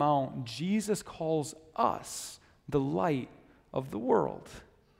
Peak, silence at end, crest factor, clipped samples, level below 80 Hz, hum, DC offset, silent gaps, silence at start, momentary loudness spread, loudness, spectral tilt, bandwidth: -12 dBFS; 0.35 s; 20 dB; under 0.1%; -62 dBFS; none; under 0.1%; none; 0 s; 16 LU; -32 LUFS; -5.5 dB/octave; 16 kHz